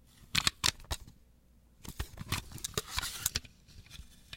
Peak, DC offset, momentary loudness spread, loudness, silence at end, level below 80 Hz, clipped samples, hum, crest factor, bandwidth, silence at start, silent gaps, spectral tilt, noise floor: -8 dBFS; under 0.1%; 22 LU; -35 LUFS; 0 s; -50 dBFS; under 0.1%; none; 32 dB; 17 kHz; 0.15 s; none; -1.5 dB/octave; -63 dBFS